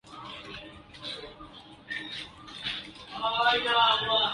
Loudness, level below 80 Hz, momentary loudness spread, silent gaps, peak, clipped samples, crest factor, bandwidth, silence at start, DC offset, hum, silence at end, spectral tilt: -27 LUFS; -60 dBFS; 23 LU; none; -10 dBFS; under 0.1%; 20 dB; 11.5 kHz; 0.05 s; under 0.1%; none; 0 s; -3 dB/octave